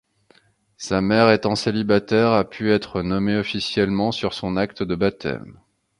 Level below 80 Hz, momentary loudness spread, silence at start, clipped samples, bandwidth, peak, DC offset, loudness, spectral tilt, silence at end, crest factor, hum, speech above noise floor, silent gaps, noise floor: -48 dBFS; 8 LU; 0.8 s; under 0.1%; 11 kHz; -2 dBFS; under 0.1%; -21 LUFS; -6 dB/octave; 0.45 s; 20 dB; none; 38 dB; none; -58 dBFS